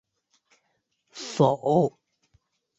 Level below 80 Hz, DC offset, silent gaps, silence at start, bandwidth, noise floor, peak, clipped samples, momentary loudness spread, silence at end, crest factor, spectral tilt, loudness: -68 dBFS; under 0.1%; none; 1.15 s; 8.2 kHz; -75 dBFS; -8 dBFS; under 0.1%; 17 LU; 0.9 s; 20 dB; -7 dB/octave; -24 LUFS